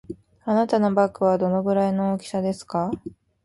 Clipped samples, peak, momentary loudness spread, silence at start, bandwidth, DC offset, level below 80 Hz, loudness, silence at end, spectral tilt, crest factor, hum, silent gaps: under 0.1%; -6 dBFS; 14 LU; 0.1 s; 11.5 kHz; under 0.1%; -58 dBFS; -23 LUFS; 0.35 s; -7.5 dB/octave; 16 dB; none; none